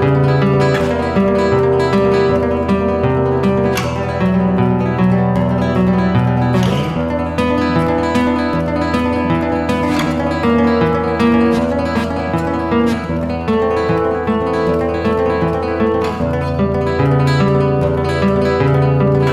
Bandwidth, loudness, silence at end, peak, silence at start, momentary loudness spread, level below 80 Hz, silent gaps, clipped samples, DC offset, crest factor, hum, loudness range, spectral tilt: 13.5 kHz; -15 LUFS; 0 s; -2 dBFS; 0 s; 4 LU; -32 dBFS; none; under 0.1%; under 0.1%; 12 dB; none; 2 LU; -7.5 dB/octave